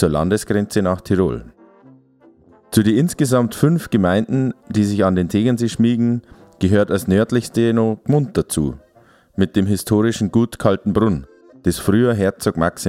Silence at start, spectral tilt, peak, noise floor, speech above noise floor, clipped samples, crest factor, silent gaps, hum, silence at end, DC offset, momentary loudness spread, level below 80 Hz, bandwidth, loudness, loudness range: 0 s; -6.5 dB/octave; 0 dBFS; -52 dBFS; 35 dB; under 0.1%; 16 dB; none; none; 0 s; under 0.1%; 6 LU; -42 dBFS; 16 kHz; -18 LUFS; 2 LU